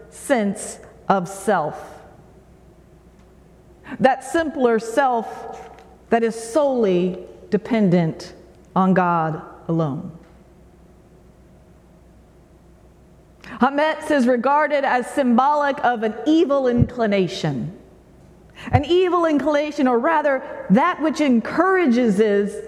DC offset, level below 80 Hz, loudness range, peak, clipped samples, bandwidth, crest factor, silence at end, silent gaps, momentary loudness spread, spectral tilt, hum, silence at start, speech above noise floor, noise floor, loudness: under 0.1%; -48 dBFS; 8 LU; -2 dBFS; under 0.1%; 13.5 kHz; 18 dB; 0 s; none; 15 LU; -6.5 dB/octave; none; 0 s; 30 dB; -49 dBFS; -19 LUFS